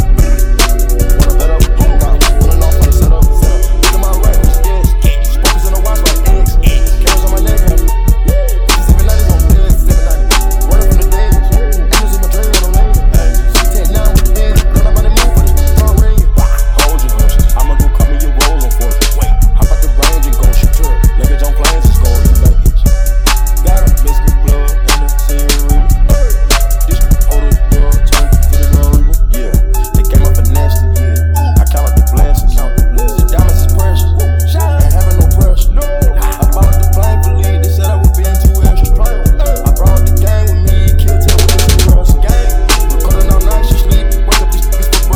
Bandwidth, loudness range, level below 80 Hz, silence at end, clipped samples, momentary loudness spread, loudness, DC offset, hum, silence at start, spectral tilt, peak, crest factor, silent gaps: 16.5 kHz; 1 LU; -8 dBFS; 0 s; 0.9%; 3 LU; -11 LUFS; 0.8%; none; 0 s; -5 dB/octave; 0 dBFS; 6 dB; none